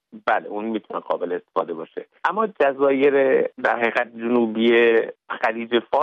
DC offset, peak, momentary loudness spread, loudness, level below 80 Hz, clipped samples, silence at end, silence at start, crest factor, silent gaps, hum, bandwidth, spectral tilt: under 0.1%; -4 dBFS; 11 LU; -21 LUFS; -70 dBFS; under 0.1%; 0 s; 0.15 s; 16 dB; none; none; 6.2 kHz; -6.5 dB/octave